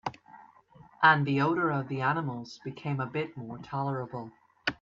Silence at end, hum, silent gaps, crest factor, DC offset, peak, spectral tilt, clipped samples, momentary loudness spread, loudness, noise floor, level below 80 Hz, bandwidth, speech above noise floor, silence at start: 0.05 s; none; none; 22 dB; under 0.1%; -8 dBFS; -7 dB/octave; under 0.1%; 18 LU; -29 LUFS; -57 dBFS; -68 dBFS; 7.4 kHz; 27 dB; 0.05 s